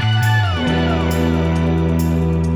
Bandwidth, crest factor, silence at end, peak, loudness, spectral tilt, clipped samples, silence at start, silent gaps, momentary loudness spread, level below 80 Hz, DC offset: over 20 kHz; 10 dB; 0 s; -6 dBFS; -17 LUFS; -6.5 dB/octave; under 0.1%; 0 s; none; 2 LU; -30 dBFS; under 0.1%